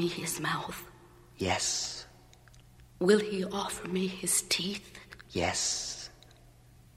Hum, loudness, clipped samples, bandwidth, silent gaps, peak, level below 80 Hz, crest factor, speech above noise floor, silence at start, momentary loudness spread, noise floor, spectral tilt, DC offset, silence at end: none; -31 LUFS; under 0.1%; 16 kHz; none; -12 dBFS; -60 dBFS; 22 dB; 26 dB; 0 s; 18 LU; -57 dBFS; -3 dB/octave; under 0.1%; 0.85 s